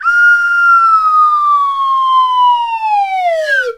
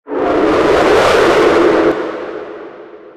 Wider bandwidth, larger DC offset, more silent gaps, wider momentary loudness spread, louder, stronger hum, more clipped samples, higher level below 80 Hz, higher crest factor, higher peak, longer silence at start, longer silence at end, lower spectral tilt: second, 13 kHz vs 14.5 kHz; neither; neither; second, 6 LU vs 18 LU; about the same, -10 LUFS vs -11 LUFS; neither; neither; second, -60 dBFS vs -38 dBFS; about the same, 8 dB vs 12 dB; about the same, -2 dBFS vs 0 dBFS; about the same, 0 s vs 0.05 s; about the same, 0 s vs 0.05 s; second, 1.5 dB/octave vs -5 dB/octave